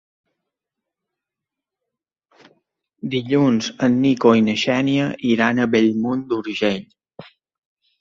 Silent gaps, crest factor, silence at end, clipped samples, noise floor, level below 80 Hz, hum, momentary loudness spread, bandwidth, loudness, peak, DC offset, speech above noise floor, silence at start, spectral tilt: none; 18 dB; 0.8 s; under 0.1%; -85 dBFS; -62 dBFS; none; 9 LU; 7.6 kHz; -18 LUFS; -2 dBFS; under 0.1%; 67 dB; 3.05 s; -6 dB/octave